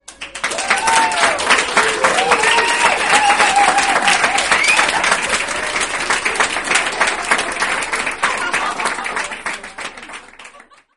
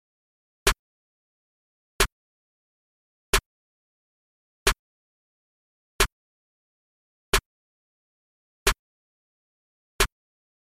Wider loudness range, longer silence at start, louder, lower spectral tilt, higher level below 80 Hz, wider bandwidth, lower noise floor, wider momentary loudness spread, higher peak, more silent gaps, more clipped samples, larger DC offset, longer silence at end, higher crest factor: first, 7 LU vs 2 LU; second, 0.1 s vs 0.65 s; first, -14 LUFS vs -26 LUFS; second, 0 dB/octave vs -1.5 dB/octave; second, -48 dBFS vs -38 dBFS; second, 11.5 kHz vs 16 kHz; second, -44 dBFS vs under -90 dBFS; first, 12 LU vs 1 LU; first, 0 dBFS vs -6 dBFS; second, none vs 0.79-1.99 s, 2.12-3.33 s, 3.46-4.66 s, 4.79-5.99 s, 6.12-7.32 s, 7.46-8.66 s, 8.79-9.99 s; neither; first, 0.4% vs under 0.1%; second, 0.35 s vs 0.6 s; second, 16 dB vs 26 dB